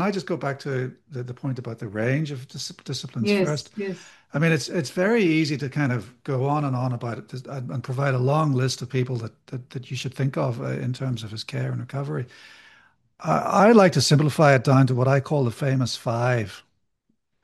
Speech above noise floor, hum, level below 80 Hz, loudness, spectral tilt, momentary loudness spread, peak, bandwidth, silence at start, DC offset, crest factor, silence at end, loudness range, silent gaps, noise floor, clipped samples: 50 dB; none; -64 dBFS; -23 LUFS; -6 dB/octave; 15 LU; -2 dBFS; 12.5 kHz; 0 s; under 0.1%; 22 dB; 0.85 s; 10 LU; none; -73 dBFS; under 0.1%